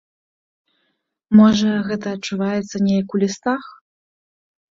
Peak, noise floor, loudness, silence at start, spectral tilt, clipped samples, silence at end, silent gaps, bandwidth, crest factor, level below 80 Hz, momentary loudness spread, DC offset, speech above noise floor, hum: -2 dBFS; -71 dBFS; -18 LUFS; 1.3 s; -6 dB/octave; under 0.1%; 1.05 s; none; 7.6 kHz; 18 dB; -56 dBFS; 12 LU; under 0.1%; 54 dB; none